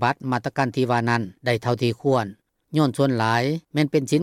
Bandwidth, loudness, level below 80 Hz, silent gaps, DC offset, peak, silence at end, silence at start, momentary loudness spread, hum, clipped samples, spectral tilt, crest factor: 14.5 kHz; -23 LUFS; -64 dBFS; none; under 0.1%; -6 dBFS; 0 s; 0 s; 5 LU; none; under 0.1%; -6.5 dB/octave; 16 dB